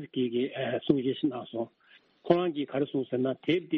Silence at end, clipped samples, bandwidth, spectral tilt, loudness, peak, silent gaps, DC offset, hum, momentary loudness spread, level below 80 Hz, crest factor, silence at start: 0 s; under 0.1%; 5.4 kHz; -5 dB/octave; -30 LUFS; -8 dBFS; none; under 0.1%; none; 10 LU; -70 dBFS; 22 dB; 0 s